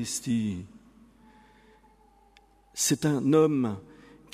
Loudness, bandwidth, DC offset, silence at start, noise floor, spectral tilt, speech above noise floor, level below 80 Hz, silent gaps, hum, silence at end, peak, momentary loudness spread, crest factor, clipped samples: -26 LUFS; 15.5 kHz; under 0.1%; 0 s; -60 dBFS; -5 dB/octave; 34 dB; -64 dBFS; none; none; 0.5 s; -10 dBFS; 19 LU; 20 dB; under 0.1%